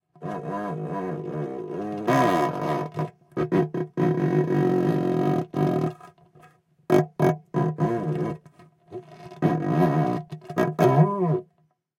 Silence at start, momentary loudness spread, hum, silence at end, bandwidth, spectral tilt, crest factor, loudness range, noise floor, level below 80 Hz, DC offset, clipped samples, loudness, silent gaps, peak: 0.2 s; 11 LU; none; 0.55 s; 16 kHz; -8.5 dB/octave; 18 dB; 3 LU; -67 dBFS; -62 dBFS; under 0.1%; under 0.1%; -25 LUFS; none; -6 dBFS